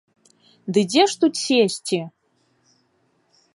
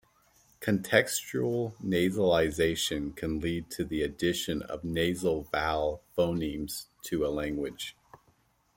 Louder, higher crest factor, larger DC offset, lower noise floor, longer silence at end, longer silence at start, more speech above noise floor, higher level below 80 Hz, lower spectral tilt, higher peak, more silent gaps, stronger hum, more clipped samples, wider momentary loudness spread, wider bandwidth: first, -20 LUFS vs -30 LUFS; second, 18 dB vs 26 dB; neither; about the same, -66 dBFS vs -68 dBFS; first, 1.45 s vs 0.85 s; about the same, 0.65 s vs 0.6 s; first, 46 dB vs 38 dB; second, -74 dBFS vs -52 dBFS; about the same, -4 dB/octave vs -4.5 dB/octave; about the same, -4 dBFS vs -6 dBFS; neither; neither; neither; first, 13 LU vs 10 LU; second, 11.5 kHz vs 17 kHz